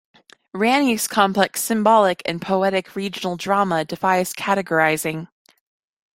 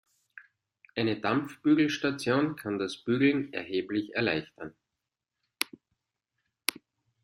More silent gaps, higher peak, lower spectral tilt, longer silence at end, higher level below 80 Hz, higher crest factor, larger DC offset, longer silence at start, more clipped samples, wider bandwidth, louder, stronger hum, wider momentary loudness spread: neither; about the same, 0 dBFS vs -2 dBFS; about the same, -4 dB/octave vs -5 dB/octave; first, 0.9 s vs 0.55 s; first, -62 dBFS vs -70 dBFS; second, 20 dB vs 28 dB; neither; first, 0.55 s vs 0.35 s; neither; about the same, 16.5 kHz vs 16 kHz; first, -19 LUFS vs -30 LUFS; neither; about the same, 10 LU vs 10 LU